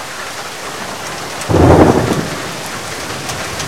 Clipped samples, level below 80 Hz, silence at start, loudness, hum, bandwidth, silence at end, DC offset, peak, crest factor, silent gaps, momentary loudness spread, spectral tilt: 0.3%; -34 dBFS; 0 s; -15 LUFS; none; 17 kHz; 0 s; 1%; 0 dBFS; 16 dB; none; 15 LU; -5 dB/octave